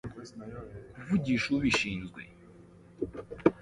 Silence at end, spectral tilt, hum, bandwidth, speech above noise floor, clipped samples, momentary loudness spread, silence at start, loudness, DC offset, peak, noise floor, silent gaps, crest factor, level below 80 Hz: 0 s; -5.5 dB/octave; none; 11.5 kHz; 23 dB; under 0.1%; 19 LU; 0.05 s; -30 LUFS; under 0.1%; -6 dBFS; -54 dBFS; none; 26 dB; -54 dBFS